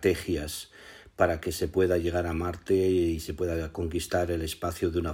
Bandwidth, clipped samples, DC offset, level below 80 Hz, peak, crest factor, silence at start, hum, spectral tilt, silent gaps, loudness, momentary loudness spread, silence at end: 16 kHz; under 0.1%; under 0.1%; -44 dBFS; -10 dBFS; 18 dB; 0 s; none; -5.5 dB/octave; none; -29 LUFS; 8 LU; 0 s